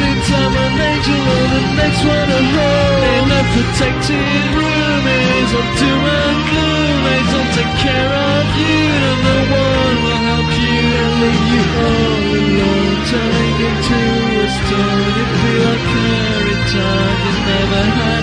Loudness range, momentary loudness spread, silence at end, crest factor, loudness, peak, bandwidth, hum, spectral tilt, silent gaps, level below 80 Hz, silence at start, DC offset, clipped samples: 1 LU; 2 LU; 0 s; 12 dB; -13 LUFS; 0 dBFS; 10 kHz; none; -5.5 dB/octave; none; -26 dBFS; 0 s; under 0.1%; under 0.1%